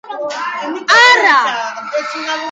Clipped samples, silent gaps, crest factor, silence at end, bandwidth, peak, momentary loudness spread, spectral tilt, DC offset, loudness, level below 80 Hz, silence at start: under 0.1%; none; 14 dB; 0 s; 9.4 kHz; 0 dBFS; 14 LU; 0 dB/octave; under 0.1%; -12 LUFS; -72 dBFS; 0.05 s